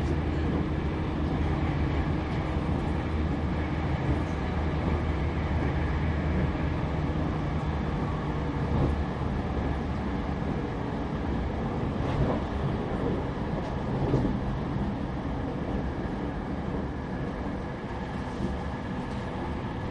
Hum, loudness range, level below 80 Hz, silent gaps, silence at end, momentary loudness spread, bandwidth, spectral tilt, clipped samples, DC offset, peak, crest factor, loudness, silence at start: none; 4 LU; -34 dBFS; none; 0 s; 5 LU; 9 kHz; -8.5 dB/octave; under 0.1%; under 0.1%; -14 dBFS; 16 dB; -30 LUFS; 0 s